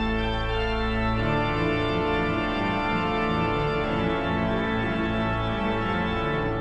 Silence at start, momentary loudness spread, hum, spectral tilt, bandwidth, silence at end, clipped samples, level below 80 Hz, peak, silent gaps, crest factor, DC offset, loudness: 0 s; 2 LU; none; -7.5 dB/octave; 8.8 kHz; 0 s; under 0.1%; -36 dBFS; -12 dBFS; none; 12 dB; under 0.1%; -25 LUFS